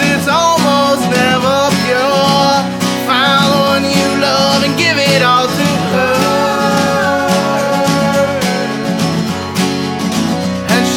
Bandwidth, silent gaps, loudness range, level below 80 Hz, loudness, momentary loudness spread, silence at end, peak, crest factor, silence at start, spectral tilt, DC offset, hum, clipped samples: 19.5 kHz; none; 3 LU; -48 dBFS; -12 LUFS; 6 LU; 0 s; 0 dBFS; 12 dB; 0 s; -4 dB/octave; under 0.1%; none; under 0.1%